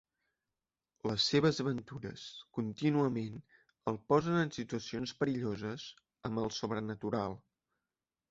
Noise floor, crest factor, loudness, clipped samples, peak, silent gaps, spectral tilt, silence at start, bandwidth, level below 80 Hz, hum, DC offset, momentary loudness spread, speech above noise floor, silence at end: under -90 dBFS; 22 dB; -35 LUFS; under 0.1%; -14 dBFS; none; -5.5 dB/octave; 1.05 s; 8 kHz; -66 dBFS; none; under 0.1%; 15 LU; over 55 dB; 0.95 s